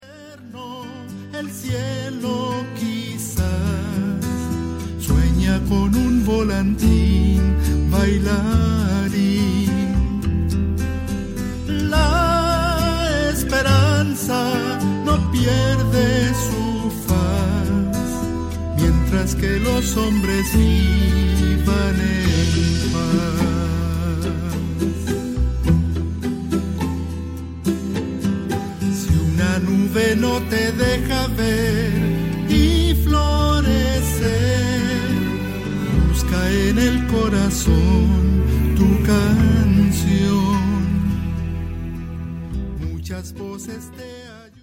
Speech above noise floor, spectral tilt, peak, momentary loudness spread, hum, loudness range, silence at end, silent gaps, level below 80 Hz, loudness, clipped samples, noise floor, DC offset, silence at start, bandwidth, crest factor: 22 dB; -6 dB/octave; -4 dBFS; 10 LU; none; 6 LU; 0.2 s; none; -24 dBFS; -19 LUFS; under 0.1%; -40 dBFS; under 0.1%; 0.05 s; 16.5 kHz; 14 dB